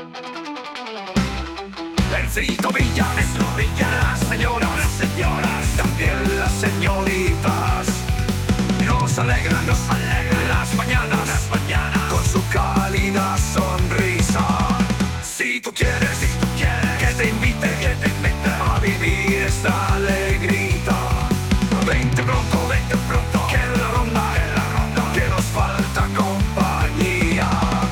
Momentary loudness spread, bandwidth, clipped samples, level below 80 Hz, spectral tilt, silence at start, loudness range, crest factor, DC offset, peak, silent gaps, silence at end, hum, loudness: 3 LU; 18 kHz; under 0.1%; -26 dBFS; -5 dB/octave; 0 s; 1 LU; 14 dB; under 0.1%; -6 dBFS; none; 0 s; none; -20 LUFS